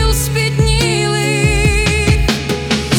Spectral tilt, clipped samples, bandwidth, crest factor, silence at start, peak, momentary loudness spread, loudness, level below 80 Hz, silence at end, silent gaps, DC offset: -4.5 dB/octave; under 0.1%; 18 kHz; 14 dB; 0 s; 0 dBFS; 4 LU; -14 LUFS; -20 dBFS; 0 s; none; under 0.1%